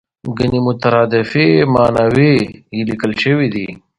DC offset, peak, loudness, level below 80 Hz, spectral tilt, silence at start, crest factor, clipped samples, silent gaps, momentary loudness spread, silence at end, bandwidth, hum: under 0.1%; 0 dBFS; -14 LUFS; -42 dBFS; -7.5 dB/octave; 0.25 s; 14 dB; under 0.1%; none; 10 LU; 0.25 s; 11 kHz; none